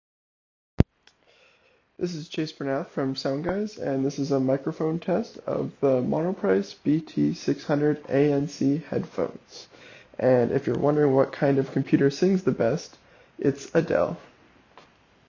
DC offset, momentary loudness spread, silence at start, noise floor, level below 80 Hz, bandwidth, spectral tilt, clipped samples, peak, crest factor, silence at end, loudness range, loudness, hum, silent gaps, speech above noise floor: under 0.1%; 10 LU; 0.8 s; -63 dBFS; -48 dBFS; 7.4 kHz; -7.5 dB/octave; under 0.1%; -2 dBFS; 24 dB; 1.05 s; 6 LU; -25 LUFS; none; none; 38 dB